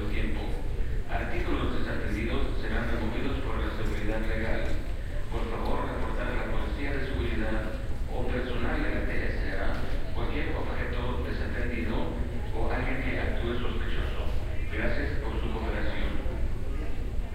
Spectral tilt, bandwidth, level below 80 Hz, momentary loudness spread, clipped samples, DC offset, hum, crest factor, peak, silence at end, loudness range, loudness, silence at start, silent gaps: -7 dB/octave; 8.8 kHz; -30 dBFS; 4 LU; under 0.1%; under 0.1%; none; 14 dB; -14 dBFS; 0 s; 1 LU; -33 LUFS; 0 s; none